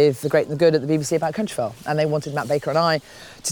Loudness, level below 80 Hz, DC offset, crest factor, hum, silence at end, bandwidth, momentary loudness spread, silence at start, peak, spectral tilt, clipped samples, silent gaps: -21 LUFS; -60 dBFS; under 0.1%; 16 dB; none; 0 s; 19.5 kHz; 8 LU; 0 s; -6 dBFS; -5 dB/octave; under 0.1%; none